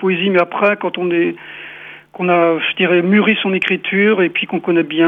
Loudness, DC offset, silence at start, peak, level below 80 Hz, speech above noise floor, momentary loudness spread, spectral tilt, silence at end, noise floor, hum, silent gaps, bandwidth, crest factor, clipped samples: -15 LUFS; under 0.1%; 0 s; 0 dBFS; -66 dBFS; 21 dB; 18 LU; -8 dB/octave; 0 s; -35 dBFS; 50 Hz at -55 dBFS; none; 4.5 kHz; 14 dB; under 0.1%